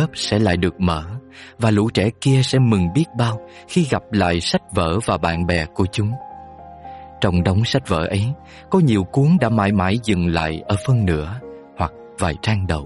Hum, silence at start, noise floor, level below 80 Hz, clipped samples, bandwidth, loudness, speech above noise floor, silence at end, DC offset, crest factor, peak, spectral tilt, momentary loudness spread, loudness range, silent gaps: none; 0 s; -38 dBFS; -38 dBFS; under 0.1%; 11.5 kHz; -19 LUFS; 20 dB; 0 s; under 0.1%; 14 dB; -4 dBFS; -6.5 dB/octave; 15 LU; 3 LU; none